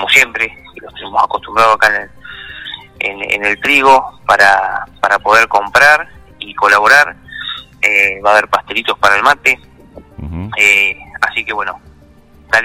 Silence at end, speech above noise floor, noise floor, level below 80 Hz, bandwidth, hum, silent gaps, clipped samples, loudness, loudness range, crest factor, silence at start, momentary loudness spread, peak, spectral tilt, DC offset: 0 s; 31 dB; -43 dBFS; -42 dBFS; 17.5 kHz; none; none; 0.1%; -11 LUFS; 4 LU; 14 dB; 0 s; 19 LU; 0 dBFS; -2 dB/octave; under 0.1%